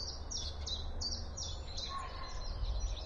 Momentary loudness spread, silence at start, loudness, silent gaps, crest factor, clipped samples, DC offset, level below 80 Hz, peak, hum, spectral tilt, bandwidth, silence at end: 5 LU; 0 s; -41 LUFS; none; 14 dB; under 0.1%; under 0.1%; -42 dBFS; -26 dBFS; none; -3 dB/octave; 10 kHz; 0 s